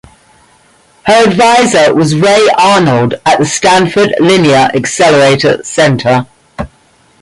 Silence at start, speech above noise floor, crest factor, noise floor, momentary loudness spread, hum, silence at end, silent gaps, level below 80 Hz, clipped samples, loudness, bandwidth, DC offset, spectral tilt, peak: 1.05 s; 40 dB; 8 dB; -47 dBFS; 8 LU; none; 0.55 s; none; -42 dBFS; under 0.1%; -8 LUFS; 11.5 kHz; under 0.1%; -4.5 dB/octave; 0 dBFS